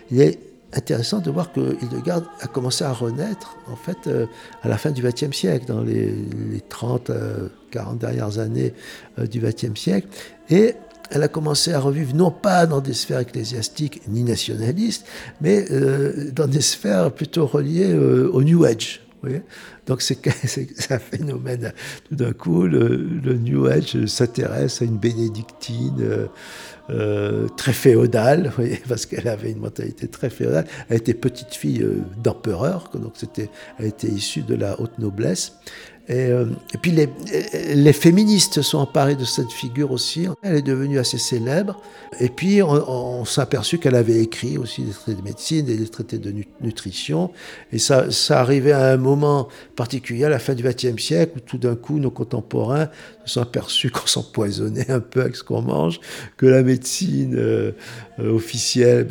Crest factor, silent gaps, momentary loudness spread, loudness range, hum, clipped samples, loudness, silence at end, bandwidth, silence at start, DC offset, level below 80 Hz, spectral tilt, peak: 20 dB; none; 13 LU; 7 LU; none; under 0.1%; -20 LUFS; 0 s; 19 kHz; 0.1 s; under 0.1%; -56 dBFS; -5.5 dB/octave; 0 dBFS